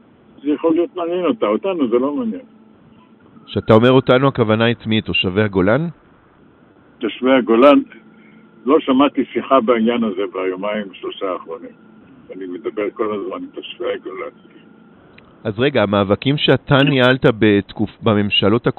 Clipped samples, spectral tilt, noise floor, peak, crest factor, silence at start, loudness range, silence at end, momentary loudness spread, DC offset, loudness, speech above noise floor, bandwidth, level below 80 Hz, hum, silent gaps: under 0.1%; -4.5 dB/octave; -49 dBFS; 0 dBFS; 18 dB; 0.45 s; 10 LU; 0.05 s; 15 LU; under 0.1%; -16 LUFS; 33 dB; 4.3 kHz; -52 dBFS; none; none